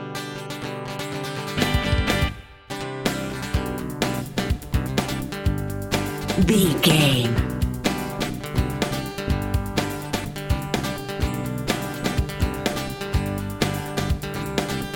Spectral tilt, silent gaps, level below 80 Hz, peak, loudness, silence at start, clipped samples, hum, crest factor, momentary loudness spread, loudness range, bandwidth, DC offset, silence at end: -5 dB/octave; none; -32 dBFS; -4 dBFS; -24 LUFS; 0 s; under 0.1%; none; 20 dB; 10 LU; 5 LU; 17 kHz; under 0.1%; 0 s